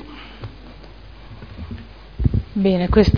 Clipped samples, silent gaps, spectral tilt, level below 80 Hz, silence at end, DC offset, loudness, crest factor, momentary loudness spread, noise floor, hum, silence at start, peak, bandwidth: under 0.1%; none; -8.5 dB/octave; -30 dBFS; 0 s; 0.4%; -19 LUFS; 20 dB; 25 LU; -40 dBFS; none; 0 s; 0 dBFS; 5.4 kHz